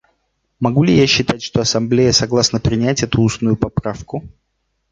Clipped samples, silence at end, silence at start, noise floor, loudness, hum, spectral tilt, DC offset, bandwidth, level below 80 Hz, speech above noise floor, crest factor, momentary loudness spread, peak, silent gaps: under 0.1%; 0.65 s; 0.6 s; -67 dBFS; -15 LUFS; none; -5 dB/octave; under 0.1%; 9.4 kHz; -38 dBFS; 52 dB; 16 dB; 11 LU; -2 dBFS; none